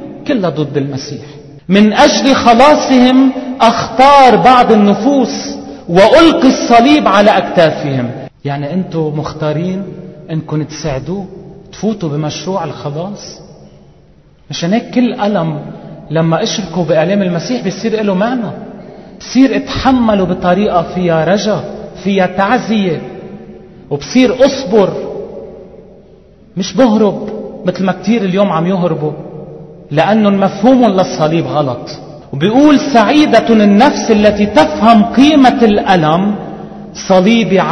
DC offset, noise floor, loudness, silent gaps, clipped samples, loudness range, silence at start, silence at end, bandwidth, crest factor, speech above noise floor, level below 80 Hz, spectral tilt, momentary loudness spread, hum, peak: 0.2%; -44 dBFS; -10 LUFS; none; 0.6%; 11 LU; 0 s; 0 s; 10.5 kHz; 10 dB; 34 dB; -40 dBFS; -6 dB/octave; 17 LU; none; 0 dBFS